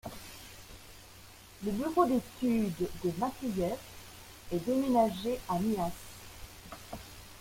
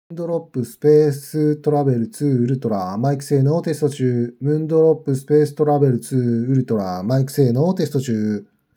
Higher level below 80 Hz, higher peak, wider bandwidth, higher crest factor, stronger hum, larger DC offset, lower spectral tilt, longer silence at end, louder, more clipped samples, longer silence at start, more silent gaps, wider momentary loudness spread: first, -56 dBFS vs -72 dBFS; second, -14 dBFS vs -4 dBFS; second, 16.5 kHz vs 19.5 kHz; first, 20 dB vs 14 dB; neither; neither; second, -6 dB/octave vs -8 dB/octave; second, 0 s vs 0.35 s; second, -32 LUFS vs -19 LUFS; neither; about the same, 0.05 s vs 0.1 s; neither; first, 21 LU vs 6 LU